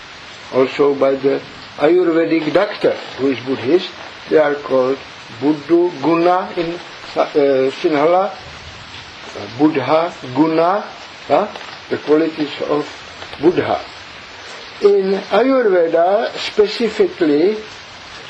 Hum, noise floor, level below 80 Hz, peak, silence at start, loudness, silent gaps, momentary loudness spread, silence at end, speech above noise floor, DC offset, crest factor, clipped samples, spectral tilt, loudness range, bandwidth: none; -35 dBFS; -54 dBFS; 0 dBFS; 0 s; -16 LUFS; none; 18 LU; 0 s; 20 dB; under 0.1%; 16 dB; under 0.1%; -6 dB/octave; 3 LU; 8.4 kHz